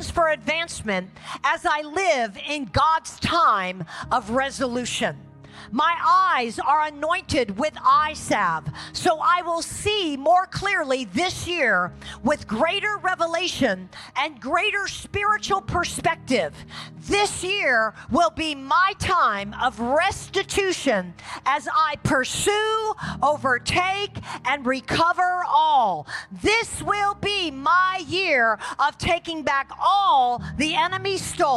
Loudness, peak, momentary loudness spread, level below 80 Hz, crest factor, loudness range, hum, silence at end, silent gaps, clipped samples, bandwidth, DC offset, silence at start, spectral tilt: -22 LUFS; -10 dBFS; 8 LU; -48 dBFS; 14 dB; 2 LU; none; 0 s; none; under 0.1%; 15 kHz; under 0.1%; 0 s; -3.5 dB/octave